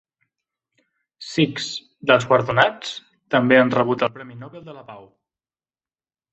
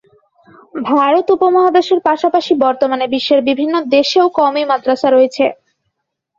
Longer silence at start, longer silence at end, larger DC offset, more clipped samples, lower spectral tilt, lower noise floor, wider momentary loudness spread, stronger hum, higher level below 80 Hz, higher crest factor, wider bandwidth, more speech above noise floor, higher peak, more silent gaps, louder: first, 1.2 s vs 0.75 s; first, 1.35 s vs 0.85 s; neither; neither; first, -5.5 dB/octave vs -4 dB/octave; first, under -90 dBFS vs -72 dBFS; first, 23 LU vs 5 LU; neither; about the same, -62 dBFS vs -60 dBFS; first, 20 dB vs 12 dB; about the same, 8.2 kHz vs 7.6 kHz; first, over 70 dB vs 60 dB; about the same, -2 dBFS vs 0 dBFS; neither; second, -19 LUFS vs -13 LUFS